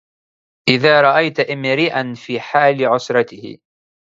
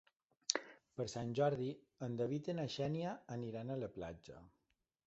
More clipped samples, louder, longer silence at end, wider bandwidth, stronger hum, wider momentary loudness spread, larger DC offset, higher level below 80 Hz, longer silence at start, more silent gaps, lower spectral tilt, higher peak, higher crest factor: neither; first, -15 LUFS vs -42 LUFS; about the same, 0.6 s vs 0.6 s; about the same, 7.8 kHz vs 8 kHz; neither; about the same, 14 LU vs 13 LU; neither; first, -62 dBFS vs -72 dBFS; first, 0.65 s vs 0.5 s; neither; about the same, -5.5 dB/octave vs -5 dB/octave; first, 0 dBFS vs -12 dBFS; second, 16 dB vs 32 dB